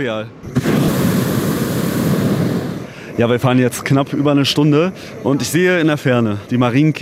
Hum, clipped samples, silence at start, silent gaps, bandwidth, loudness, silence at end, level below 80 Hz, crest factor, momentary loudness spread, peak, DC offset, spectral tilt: none; under 0.1%; 0 s; none; 16 kHz; -16 LUFS; 0 s; -44 dBFS; 14 dB; 9 LU; -2 dBFS; under 0.1%; -6 dB/octave